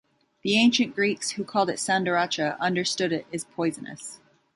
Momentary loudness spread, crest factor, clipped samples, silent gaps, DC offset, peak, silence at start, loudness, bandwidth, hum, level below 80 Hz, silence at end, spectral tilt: 14 LU; 18 dB; under 0.1%; none; under 0.1%; -8 dBFS; 0.45 s; -25 LUFS; 11.5 kHz; none; -70 dBFS; 0.4 s; -3.5 dB/octave